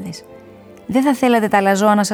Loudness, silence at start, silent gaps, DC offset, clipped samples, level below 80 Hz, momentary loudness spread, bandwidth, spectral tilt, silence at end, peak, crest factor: -15 LUFS; 0 s; none; under 0.1%; under 0.1%; -58 dBFS; 20 LU; 19 kHz; -5 dB/octave; 0 s; -2 dBFS; 14 dB